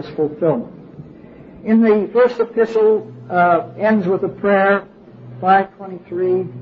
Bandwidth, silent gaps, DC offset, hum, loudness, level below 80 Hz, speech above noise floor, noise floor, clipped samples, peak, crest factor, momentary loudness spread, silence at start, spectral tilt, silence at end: 6.4 kHz; none; under 0.1%; none; -16 LUFS; -56 dBFS; 23 dB; -39 dBFS; under 0.1%; -2 dBFS; 14 dB; 9 LU; 0 s; -9 dB/octave; 0 s